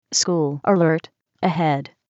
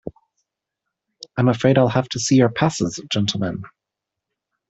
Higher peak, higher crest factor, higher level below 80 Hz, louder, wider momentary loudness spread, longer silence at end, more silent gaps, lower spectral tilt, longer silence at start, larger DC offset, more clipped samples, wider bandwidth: about the same, -6 dBFS vs -4 dBFS; about the same, 14 dB vs 18 dB; second, -74 dBFS vs -54 dBFS; about the same, -20 LUFS vs -19 LUFS; second, 7 LU vs 13 LU; second, 0.25 s vs 1.05 s; neither; about the same, -4.5 dB/octave vs -5.5 dB/octave; about the same, 0.1 s vs 0.05 s; neither; neither; about the same, 8.2 kHz vs 8.2 kHz